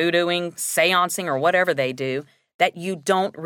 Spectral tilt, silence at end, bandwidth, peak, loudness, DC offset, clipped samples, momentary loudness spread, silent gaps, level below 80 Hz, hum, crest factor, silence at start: -3 dB/octave; 0 s; 17.5 kHz; -4 dBFS; -21 LUFS; under 0.1%; under 0.1%; 9 LU; 2.54-2.59 s; -76 dBFS; none; 16 dB; 0 s